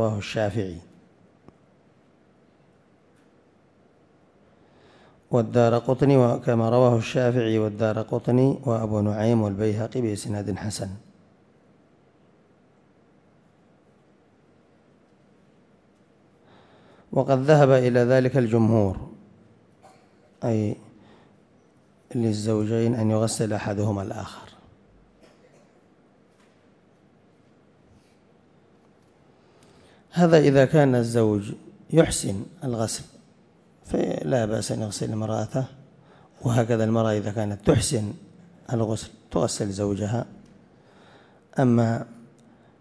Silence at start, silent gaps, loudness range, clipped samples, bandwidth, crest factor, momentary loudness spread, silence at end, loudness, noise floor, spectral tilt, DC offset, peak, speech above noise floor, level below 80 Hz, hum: 0 s; none; 11 LU; under 0.1%; 11 kHz; 22 dB; 14 LU; 0.65 s; -23 LUFS; -59 dBFS; -6.5 dB/octave; under 0.1%; -4 dBFS; 37 dB; -54 dBFS; none